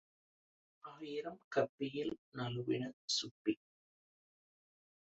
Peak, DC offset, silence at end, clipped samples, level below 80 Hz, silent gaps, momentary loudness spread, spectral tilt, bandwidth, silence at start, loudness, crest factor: -20 dBFS; under 0.1%; 1.5 s; under 0.1%; -80 dBFS; 1.44-1.51 s, 1.69-1.78 s, 2.18-2.32 s, 2.93-3.08 s, 3.31-3.45 s; 9 LU; -4 dB/octave; 7.6 kHz; 0.85 s; -40 LUFS; 24 dB